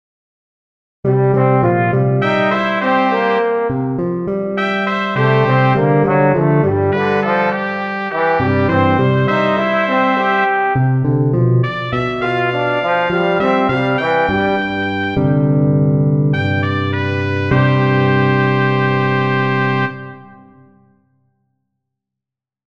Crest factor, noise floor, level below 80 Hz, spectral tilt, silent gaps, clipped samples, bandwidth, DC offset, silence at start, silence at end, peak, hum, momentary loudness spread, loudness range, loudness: 14 dB; -85 dBFS; -46 dBFS; -8.5 dB/octave; none; under 0.1%; 6.2 kHz; under 0.1%; 1.05 s; 2.45 s; -2 dBFS; none; 5 LU; 2 LU; -15 LUFS